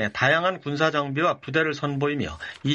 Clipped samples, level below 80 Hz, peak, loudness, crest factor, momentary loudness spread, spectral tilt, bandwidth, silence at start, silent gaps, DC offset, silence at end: under 0.1%; -54 dBFS; -4 dBFS; -24 LUFS; 20 dB; 8 LU; -5.5 dB/octave; 8.4 kHz; 0 s; none; under 0.1%; 0 s